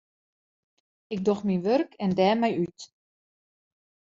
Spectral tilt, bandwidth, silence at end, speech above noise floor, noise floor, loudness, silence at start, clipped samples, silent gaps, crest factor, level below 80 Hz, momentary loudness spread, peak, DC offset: -5.5 dB/octave; 7.6 kHz; 1.3 s; over 65 dB; under -90 dBFS; -26 LUFS; 1.1 s; under 0.1%; none; 20 dB; -68 dBFS; 11 LU; -8 dBFS; under 0.1%